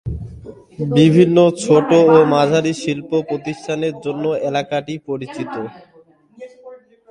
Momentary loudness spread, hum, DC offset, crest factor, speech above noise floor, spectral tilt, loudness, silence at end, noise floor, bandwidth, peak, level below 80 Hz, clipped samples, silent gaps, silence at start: 18 LU; none; under 0.1%; 16 dB; 34 dB; -6.5 dB/octave; -16 LUFS; 0.35 s; -49 dBFS; 11 kHz; 0 dBFS; -44 dBFS; under 0.1%; none; 0.05 s